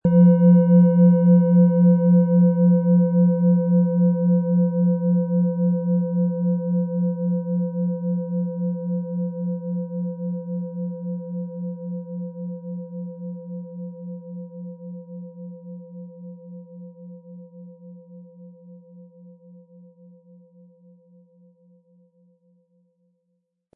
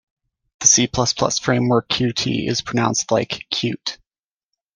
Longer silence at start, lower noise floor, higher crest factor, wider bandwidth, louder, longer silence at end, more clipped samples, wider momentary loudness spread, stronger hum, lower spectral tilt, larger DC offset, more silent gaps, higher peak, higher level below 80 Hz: second, 0.05 s vs 0.6 s; second, -74 dBFS vs under -90 dBFS; about the same, 16 dB vs 20 dB; second, 1.6 kHz vs 10.5 kHz; about the same, -20 LUFS vs -18 LUFS; first, 4.7 s vs 0.8 s; neither; first, 24 LU vs 9 LU; neither; first, -15.5 dB/octave vs -3 dB/octave; neither; neither; second, -6 dBFS vs 0 dBFS; second, -64 dBFS vs -50 dBFS